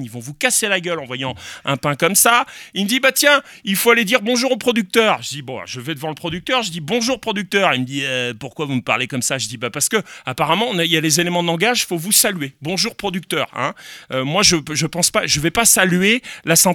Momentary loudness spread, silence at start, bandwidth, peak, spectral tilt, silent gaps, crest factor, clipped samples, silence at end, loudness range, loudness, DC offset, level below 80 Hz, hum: 12 LU; 0 s; 19.5 kHz; 0 dBFS; -2.5 dB/octave; none; 18 dB; under 0.1%; 0 s; 4 LU; -17 LUFS; under 0.1%; -52 dBFS; none